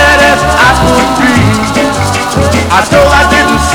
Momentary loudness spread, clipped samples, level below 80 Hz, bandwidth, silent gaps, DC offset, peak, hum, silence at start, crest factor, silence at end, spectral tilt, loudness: 5 LU; 2%; -20 dBFS; over 20 kHz; none; under 0.1%; 0 dBFS; none; 0 s; 6 dB; 0 s; -4.5 dB/octave; -7 LUFS